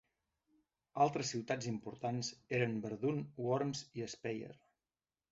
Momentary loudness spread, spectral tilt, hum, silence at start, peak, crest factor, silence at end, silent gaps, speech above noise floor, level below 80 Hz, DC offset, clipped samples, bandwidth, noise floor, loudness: 9 LU; -5 dB/octave; none; 0.95 s; -18 dBFS; 22 dB; 0.75 s; none; over 52 dB; -76 dBFS; under 0.1%; under 0.1%; 7.6 kHz; under -90 dBFS; -39 LUFS